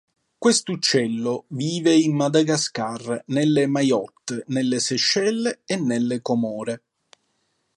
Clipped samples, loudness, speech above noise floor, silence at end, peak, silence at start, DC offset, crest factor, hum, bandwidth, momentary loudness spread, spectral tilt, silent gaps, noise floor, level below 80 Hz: under 0.1%; -22 LUFS; 49 dB; 1 s; -4 dBFS; 0.4 s; under 0.1%; 18 dB; none; 11.5 kHz; 9 LU; -4 dB/octave; none; -71 dBFS; -68 dBFS